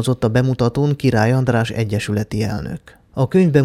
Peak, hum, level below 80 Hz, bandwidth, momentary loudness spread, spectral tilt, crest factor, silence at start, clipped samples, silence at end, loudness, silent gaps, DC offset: -2 dBFS; none; -42 dBFS; 13.5 kHz; 11 LU; -7 dB/octave; 16 dB; 0 s; under 0.1%; 0 s; -18 LUFS; none; under 0.1%